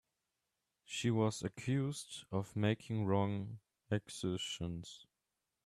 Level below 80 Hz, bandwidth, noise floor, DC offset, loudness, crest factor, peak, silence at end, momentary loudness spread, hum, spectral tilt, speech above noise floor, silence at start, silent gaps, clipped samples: -70 dBFS; 13 kHz; -89 dBFS; under 0.1%; -39 LUFS; 20 dB; -20 dBFS; 0.6 s; 13 LU; none; -5.5 dB/octave; 51 dB; 0.9 s; none; under 0.1%